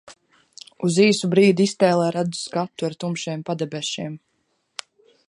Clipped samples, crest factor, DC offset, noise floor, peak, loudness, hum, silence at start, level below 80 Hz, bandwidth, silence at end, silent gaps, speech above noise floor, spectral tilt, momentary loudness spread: under 0.1%; 18 dB; under 0.1%; -65 dBFS; -4 dBFS; -21 LUFS; none; 0.05 s; -70 dBFS; 11.5 kHz; 1.1 s; none; 45 dB; -5 dB/octave; 20 LU